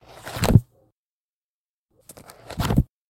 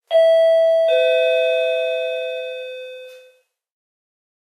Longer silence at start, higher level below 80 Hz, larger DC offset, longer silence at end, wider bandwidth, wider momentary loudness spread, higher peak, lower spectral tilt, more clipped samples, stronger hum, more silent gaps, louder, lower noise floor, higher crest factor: first, 0.25 s vs 0.1 s; first, -36 dBFS vs under -90 dBFS; neither; second, 0.25 s vs 1.25 s; first, 17 kHz vs 12 kHz; first, 24 LU vs 18 LU; first, 0 dBFS vs -6 dBFS; first, -6.5 dB/octave vs 3 dB/octave; neither; neither; first, 0.92-1.89 s vs none; second, -22 LUFS vs -17 LUFS; first, under -90 dBFS vs -56 dBFS; first, 24 dB vs 12 dB